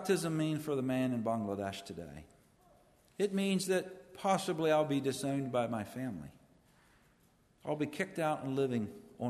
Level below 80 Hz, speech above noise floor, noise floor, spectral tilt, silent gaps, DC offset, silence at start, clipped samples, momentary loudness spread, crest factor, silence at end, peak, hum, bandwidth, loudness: -70 dBFS; 34 dB; -69 dBFS; -5.5 dB/octave; none; under 0.1%; 0 s; under 0.1%; 16 LU; 18 dB; 0 s; -18 dBFS; none; 13.5 kHz; -35 LUFS